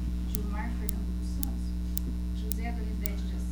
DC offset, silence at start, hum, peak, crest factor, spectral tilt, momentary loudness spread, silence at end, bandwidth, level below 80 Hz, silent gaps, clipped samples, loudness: under 0.1%; 0 s; 60 Hz at -30 dBFS; -2 dBFS; 30 dB; -6 dB/octave; 2 LU; 0 s; over 20 kHz; -32 dBFS; none; under 0.1%; -33 LUFS